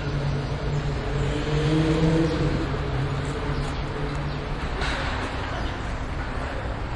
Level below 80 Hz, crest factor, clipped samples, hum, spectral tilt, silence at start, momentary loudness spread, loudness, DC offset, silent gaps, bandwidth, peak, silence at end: -32 dBFS; 16 dB; under 0.1%; none; -6.5 dB/octave; 0 s; 8 LU; -27 LUFS; under 0.1%; none; 11 kHz; -10 dBFS; 0 s